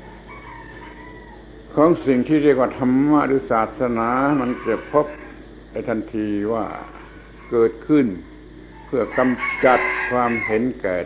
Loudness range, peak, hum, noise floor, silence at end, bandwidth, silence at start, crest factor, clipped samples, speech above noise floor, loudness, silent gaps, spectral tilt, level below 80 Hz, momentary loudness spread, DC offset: 5 LU; -2 dBFS; none; -40 dBFS; 0 s; 4 kHz; 0 s; 18 dB; under 0.1%; 22 dB; -20 LUFS; none; -10.5 dB/octave; -46 dBFS; 22 LU; under 0.1%